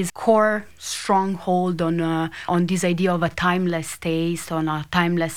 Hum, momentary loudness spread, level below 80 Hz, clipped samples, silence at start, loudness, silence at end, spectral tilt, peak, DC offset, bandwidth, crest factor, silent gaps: none; 7 LU; -52 dBFS; under 0.1%; 0 s; -22 LUFS; 0 s; -5.5 dB/octave; -4 dBFS; 0.5%; 16 kHz; 18 dB; none